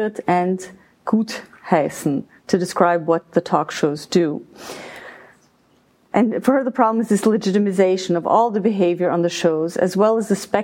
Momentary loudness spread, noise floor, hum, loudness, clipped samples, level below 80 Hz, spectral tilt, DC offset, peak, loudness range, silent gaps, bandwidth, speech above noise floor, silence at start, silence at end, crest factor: 13 LU; -58 dBFS; none; -19 LUFS; under 0.1%; -64 dBFS; -6 dB/octave; under 0.1%; 0 dBFS; 5 LU; none; 16.5 kHz; 39 dB; 0 s; 0 s; 18 dB